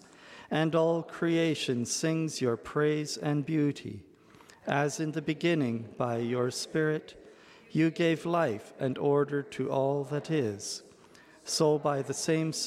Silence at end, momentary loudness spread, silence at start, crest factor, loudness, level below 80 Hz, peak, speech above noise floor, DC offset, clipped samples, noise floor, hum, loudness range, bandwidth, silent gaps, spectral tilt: 0 s; 8 LU; 0.2 s; 20 dB; -30 LUFS; -72 dBFS; -10 dBFS; 27 dB; under 0.1%; under 0.1%; -56 dBFS; none; 2 LU; 15 kHz; none; -5 dB/octave